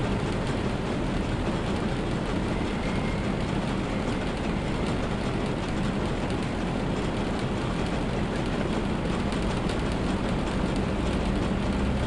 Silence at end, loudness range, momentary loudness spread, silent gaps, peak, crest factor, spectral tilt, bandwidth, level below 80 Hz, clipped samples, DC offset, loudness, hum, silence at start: 0 s; 1 LU; 2 LU; none; -14 dBFS; 14 dB; -6.5 dB/octave; 11.5 kHz; -36 dBFS; under 0.1%; 0.2%; -28 LUFS; none; 0 s